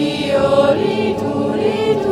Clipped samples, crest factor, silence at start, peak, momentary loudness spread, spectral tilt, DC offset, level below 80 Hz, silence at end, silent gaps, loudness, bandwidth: under 0.1%; 14 dB; 0 s; 0 dBFS; 5 LU; -6 dB/octave; under 0.1%; -48 dBFS; 0 s; none; -16 LUFS; 12.5 kHz